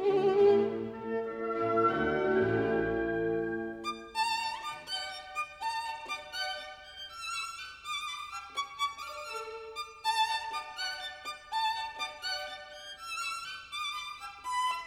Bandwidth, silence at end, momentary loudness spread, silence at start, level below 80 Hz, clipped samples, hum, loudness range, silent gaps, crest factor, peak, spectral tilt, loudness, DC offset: 16 kHz; 0 s; 13 LU; 0 s; -62 dBFS; under 0.1%; 50 Hz at -75 dBFS; 7 LU; none; 18 dB; -16 dBFS; -4 dB/octave; -33 LUFS; under 0.1%